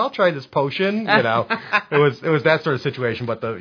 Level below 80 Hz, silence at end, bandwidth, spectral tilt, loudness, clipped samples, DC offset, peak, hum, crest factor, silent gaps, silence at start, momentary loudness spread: -62 dBFS; 0 s; 5.4 kHz; -7 dB/octave; -19 LUFS; under 0.1%; under 0.1%; 0 dBFS; none; 20 dB; none; 0 s; 7 LU